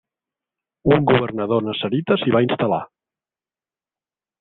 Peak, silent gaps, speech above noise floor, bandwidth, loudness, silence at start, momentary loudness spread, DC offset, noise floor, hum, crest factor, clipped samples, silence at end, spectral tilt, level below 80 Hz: -2 dBFS; none; over 72 dB; 4.3 kHz; -19 LUFS; 0.85 s; 7 LU; under 0.1%; under -90 dBFS; none; 20 dB; under 0.1%; 1.55 s; -10.5 dB/octave; -52 dBFS